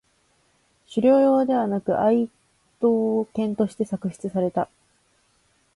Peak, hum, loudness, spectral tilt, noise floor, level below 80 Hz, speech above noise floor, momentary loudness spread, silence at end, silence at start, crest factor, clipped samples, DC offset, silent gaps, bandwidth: -8 dBFS; none; -23 LUFS; -8 dB/octave; -65 dBFS; -64 dBFS; 44 dB; 11 LU; 1.1 s; 0.9 s; 16 dB; under 0.1%; under 0.1%; none; 11.5 kHz